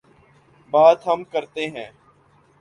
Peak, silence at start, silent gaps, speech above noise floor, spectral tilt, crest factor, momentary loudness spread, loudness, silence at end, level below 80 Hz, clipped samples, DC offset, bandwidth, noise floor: -2 dBFS; 0.75 s; none; 38 dB; -5 dB/octave; 20 dB; 19 LU; -19 LUFS; 0.75 s; -68 dBFS; under 0.1%; under 0.1%; 9.8 kHz; -57 dBFS